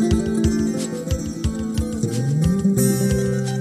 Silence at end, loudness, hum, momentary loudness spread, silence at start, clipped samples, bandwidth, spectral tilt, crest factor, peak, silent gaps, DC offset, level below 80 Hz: 0 s; -21 LUFS; none; 7 LU; 0 s; under 0.1%; 15.5 kHz; -6.5 dB/octave; 14 dB; -6 dBFS; none; under 0.1%; -32 dBFS